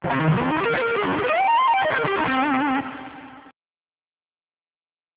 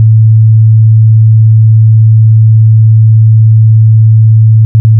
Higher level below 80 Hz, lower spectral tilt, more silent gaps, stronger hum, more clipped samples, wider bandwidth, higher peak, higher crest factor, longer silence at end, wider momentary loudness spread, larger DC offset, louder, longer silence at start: second, -54 dBFS vs -34 dBFS; second, -9.5 dB/octave vs -19.5 dB/octave; second, none vs 4.65-4.85 s; neither; neither; first, 4 kHz vs 0.6 kHz; second, -8 dBFS vs 0 dBFS; first, 14 dB vs 4 dB; first, 1.65 s vs 0 s; first, 15 LU vs 0 LU; neither; second, -21 LUFS vs -5 LUFS; about the same, 0 s vs 0 s